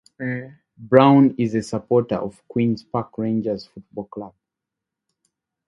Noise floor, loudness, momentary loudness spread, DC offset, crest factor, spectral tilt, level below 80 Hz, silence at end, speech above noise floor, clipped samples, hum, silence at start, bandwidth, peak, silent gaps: -85 dBFS; -20 LUFS; 21 LU; under 0.1%; 22 dB; -8 dB/octave; -58 dBFS; 1.4 s; 65 dB; under 0.1%; none; 0.2 s; 11 kHz; 0 dBFS; none